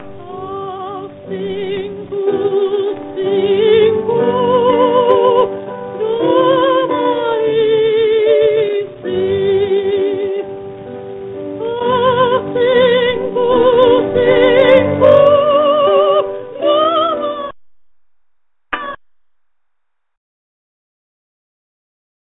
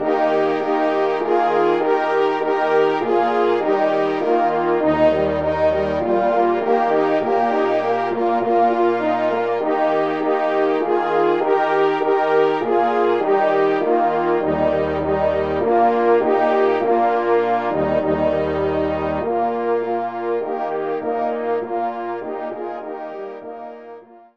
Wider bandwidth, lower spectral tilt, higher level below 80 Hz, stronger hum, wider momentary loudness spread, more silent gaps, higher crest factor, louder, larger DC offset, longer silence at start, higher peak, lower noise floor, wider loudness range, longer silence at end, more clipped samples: second, 4.1 kHz vs 7 kHz; about the same, -8.5 dB/octave vs -7.5 dB/octave; about the same, -50 dBFS vs -50 dBFS; neither; first, 16 LU vs 7 LU; neither; about the same, 14 dB vs 14 dB; first, -13 LUFS vs -19 LUFS; second, under 0.1% vs 0.4%; about the same, 0 s vs 0 s; first, 0 dBFS vs -4 dBFS; first, -71 dBFS vs -40 dBFS; first, 11 LU vs 5 LU; first, 3.3 s vs 0.2 s; neither